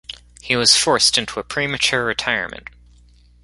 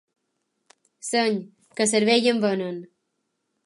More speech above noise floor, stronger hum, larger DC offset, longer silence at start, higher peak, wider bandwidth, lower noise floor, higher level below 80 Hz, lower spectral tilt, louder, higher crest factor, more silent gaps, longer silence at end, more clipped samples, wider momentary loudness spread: second, 31 dB vs 54 dB; first, 60 Hz at -45 dBFS vs none; neither; second, 0.1 s vs 1.05 s; first, 0 dBFS vs -8 dBFS; about the same, 12 kHz vs 11.5 kHz; second, -50 dBFS vs -77 dBFS; first, -48 dBFS vs -78 dBFS; second, -1.5 dB/octave vs -3.5 dB/octave; first, -16 LUFS vs -22 LUFS; about the same, 20 dB vs 18 dB; neither; about the same, 0.85 s vs 0.8 s; neither; first, 20 LU vs 17 LU